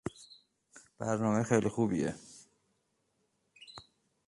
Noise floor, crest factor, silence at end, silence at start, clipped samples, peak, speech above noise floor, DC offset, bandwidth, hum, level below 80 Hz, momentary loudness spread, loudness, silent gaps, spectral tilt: -78 dBFS; 24 dB; 0.45 s; 0.05 s; under 0.1%; -12 dBFS; 47 dB; under 0.1%; 11.5 kHz; none; -66 dBFS; 24 LU; -32 LUFS; none; -6.5 dB/octave